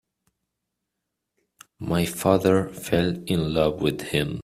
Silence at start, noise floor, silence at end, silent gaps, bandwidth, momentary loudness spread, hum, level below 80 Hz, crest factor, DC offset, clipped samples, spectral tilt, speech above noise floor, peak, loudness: 1.8 s; -82 dBFS; 0 s; none; 16 kHz; 6 LU; none; -50 dBFS; 20 dB; under 0.1%; under 0.1%; -6 dB/octave; 59 dB; -6 dBFS; -23 LUFS